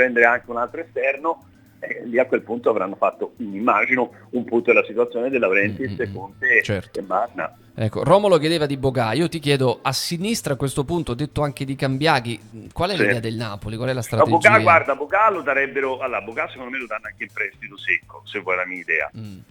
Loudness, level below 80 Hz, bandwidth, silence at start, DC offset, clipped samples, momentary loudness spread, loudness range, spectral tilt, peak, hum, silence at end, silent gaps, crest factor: -20 LUFS; -52 dBFS; 18.5 kHz; 0 s; under 0.1%; under 0.1%; 13 LU; 5 LU; -5 dB/octave; 0 dBFS; none; 0.1 s; none; 20 dB